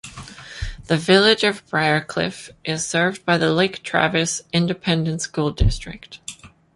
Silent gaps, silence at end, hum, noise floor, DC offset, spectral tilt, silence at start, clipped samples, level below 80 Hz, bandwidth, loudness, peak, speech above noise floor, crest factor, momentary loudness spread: none; 0.3 s; none; -40 dBFS; under 0.1%; -4 dB/octave; 0.05 s; under 0.1%; -34 dBFS; 11.5 kHz; -20 LUFS; -2 dBFS; 20 dB; 20 dB; 19 LU